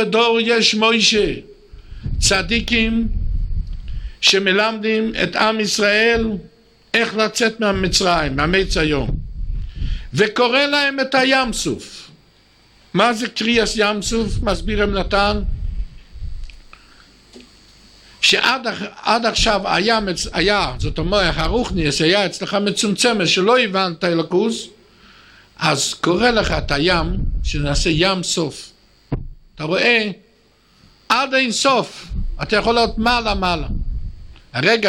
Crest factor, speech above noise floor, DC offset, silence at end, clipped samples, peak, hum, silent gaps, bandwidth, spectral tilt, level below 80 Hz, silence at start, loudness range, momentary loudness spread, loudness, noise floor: 18 dB; 37 dB; under 0.1%; 0 s; under 0.1%; 0 dBFS; none; none; 15 kHz; -3.5 dB/octave; -30 dBFS; 0 s; 4 LU; 15 LU; -17 LUFS; -55 dBFS